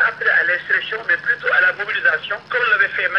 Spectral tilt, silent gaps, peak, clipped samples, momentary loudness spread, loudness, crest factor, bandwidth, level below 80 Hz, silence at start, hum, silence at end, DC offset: -3.5 dB/octave; none; -4 dBFS; under 0.1%; 4 LU; -17 LUFS; 14 dB; 6.8 kHz; -64 dBFS; 0 s; none; 0 s; under 0.1%